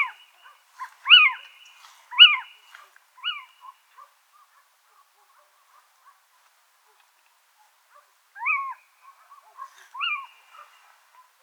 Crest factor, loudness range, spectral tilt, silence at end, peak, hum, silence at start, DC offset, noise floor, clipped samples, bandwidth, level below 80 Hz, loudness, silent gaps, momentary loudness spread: 26 dB; 21 LU; 8 dB/octave; 1.2 s; 0 dBFS; none; 0 s; under 0.1%; -63 dBFS; under 0.1%; 19.5 kHz; under -90 dBFS; -17 LUFS; none; 26 LU